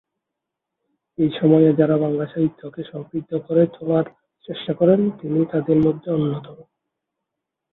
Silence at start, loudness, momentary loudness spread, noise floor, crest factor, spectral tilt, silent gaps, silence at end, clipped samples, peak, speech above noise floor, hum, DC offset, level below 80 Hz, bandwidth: 1.2 s; -20 LUFS; 16 LU; -83 dBFS; 18 dB; -11.5 dB/octave; none; 1.1 s; under 0.1%; -2 dBFS; 63 dB; none; under 0.1%; -58 dBFS; 4.1 kHz